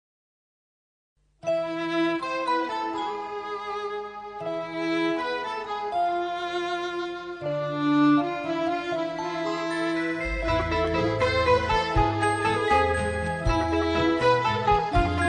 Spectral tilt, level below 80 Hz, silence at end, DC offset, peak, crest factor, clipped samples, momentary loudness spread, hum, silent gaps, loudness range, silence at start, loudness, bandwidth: -6 dB/octave; -40 dBFS; 0 s; under 0.1%; -8 dBFS; 18 dB; under 0.1%; 10 LU; none; none; 6 LU; 1.45 s; -26 LUFS; 10 kHz